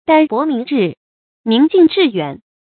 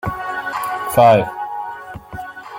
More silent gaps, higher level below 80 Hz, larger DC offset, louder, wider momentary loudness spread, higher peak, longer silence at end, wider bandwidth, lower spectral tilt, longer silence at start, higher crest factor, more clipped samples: first, 0.97-1.44 s vs none; second, -60 dBFS vs -46 dBFS; neither; first, -14 LUFS vs -17 LUFS; second, 12 LU vs 20 LU; about the same, 0 dBFS vs -2 dBFS; first, 0.25 s vs 0 s; second, 4.6 kHz vs 17 kHz; first, -11 dB/octave vs -5.5 dB/octave; about the same, 0.1 s vs 0.05 s; about the same, 14 dB vs 18 dB; neither